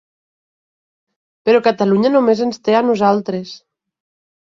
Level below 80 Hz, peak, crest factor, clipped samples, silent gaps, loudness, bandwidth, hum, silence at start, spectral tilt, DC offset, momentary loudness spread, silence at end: -62 dBFS; -2 dBFS; 16 dB; under 0.1%; none; -15 LUFS; 7.4 kHz; none; 1.45 s; -6.5 dB/octave; under 0.1%; 11 LU; 0.85 s